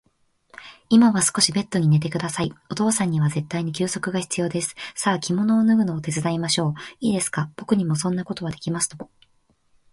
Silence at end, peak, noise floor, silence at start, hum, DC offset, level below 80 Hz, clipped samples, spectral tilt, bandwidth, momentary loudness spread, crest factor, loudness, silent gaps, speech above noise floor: 0.9 s; -2 dBFS; -65 dBFS; 0.6 s; none; under 0.1%; -58 dBFS; under 0.1%; -4.5 dB/octave; 11.5 kHz; 10 LU; 20 dB; -22 LUFS; none; 43 dB